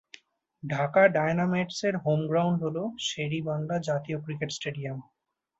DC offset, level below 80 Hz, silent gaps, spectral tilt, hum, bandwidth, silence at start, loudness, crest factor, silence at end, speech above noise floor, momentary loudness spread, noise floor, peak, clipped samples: under 0.1%; -68 dBFS; none; -5.5 dB/octave; none; 8 kHz; 0.65 s; -28 LUFS; 22 dB; 0.55 s; 28 dB; 12 LU; -55 dBFS; -8 dBFS; under 0.1%